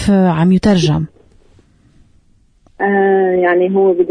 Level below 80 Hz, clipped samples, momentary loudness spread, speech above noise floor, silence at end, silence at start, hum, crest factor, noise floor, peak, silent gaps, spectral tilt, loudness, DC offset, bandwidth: -40 dBFS; under 0.1%; 7 LU; 40 dB; 0 s; 0 s; none; 12 dB; -51 dBFS; -2 dBFS; none; -7 dB/octave; -13 LUFS; under 0.1%; 10 kHz